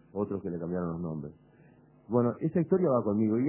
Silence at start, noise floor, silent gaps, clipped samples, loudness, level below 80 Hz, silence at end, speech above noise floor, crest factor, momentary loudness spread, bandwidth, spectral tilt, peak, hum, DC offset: 0.15 s; -58 dBFS; none; under 0.1%; -30 LUFS; -60 dBFS; 0 s; 30 dB; 16 dB; 11 LU; 2.9 kHz; -13 dB/octave; -14 dBFS; none; under 0.1%